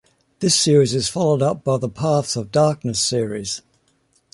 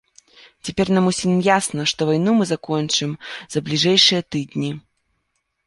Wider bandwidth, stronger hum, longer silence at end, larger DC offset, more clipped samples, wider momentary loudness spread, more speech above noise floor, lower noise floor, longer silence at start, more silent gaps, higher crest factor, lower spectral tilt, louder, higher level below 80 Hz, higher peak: about the same, 11.5 kHz vs 11.5 kHz; neither; about the same, 0.75 s vs 0.85 s; neither; neither; second, 9 LU vs 14 LU; second, 44 dB vs 53 dB; second, -63 dBFS vs -72 dBFS; second, 0.4 s vs 0.65 s; neither; about the same, 16 dB vs 18 dB; about the same, -4.5 dB/octave vs -4 dB/octave; about the same, -19 LUFS vs -19 LUFS; about the same, -54 dBFS vs -56 dBFS; about the same, -4 dBFS vs -2 dBFS